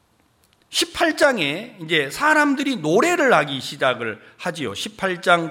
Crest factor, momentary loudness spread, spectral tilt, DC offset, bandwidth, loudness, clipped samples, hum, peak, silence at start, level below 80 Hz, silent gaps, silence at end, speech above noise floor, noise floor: 20 dB; 11 LU; -3.5 dB/octave; under 0.1%; 17 kHz; -20 LUFS; under 0.1%; none; 0 dBFS; 0.7 s; -60 dBFS; none; 0 s; 41 dB; -61 dBFS